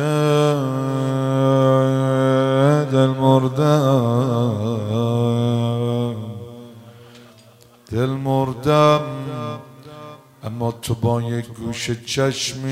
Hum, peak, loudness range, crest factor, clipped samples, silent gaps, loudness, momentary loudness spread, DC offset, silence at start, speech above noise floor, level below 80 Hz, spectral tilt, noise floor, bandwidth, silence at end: none; -2 dBFS; 8 LU; 18 dB; under 0.1%; none; -19 LUFS; 15 LU; under 0.1%; 0 s; 29 dB; -56 dBFS; -6.5 dB/octave; -48 dBFS; 15 kHz; 0 s